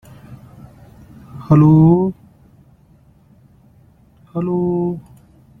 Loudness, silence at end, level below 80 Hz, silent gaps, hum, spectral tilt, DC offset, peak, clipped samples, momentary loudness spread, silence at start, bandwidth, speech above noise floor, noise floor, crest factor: -15 LUFS; 0.6 s; -48 dBFS; none; none; -12 dB/octave; under 0.1%; -2 dBFS; under 0.1%; 22 LU; 0.3 s; 2.9 kHz; 38 dB; -50 dBFS; 16 dB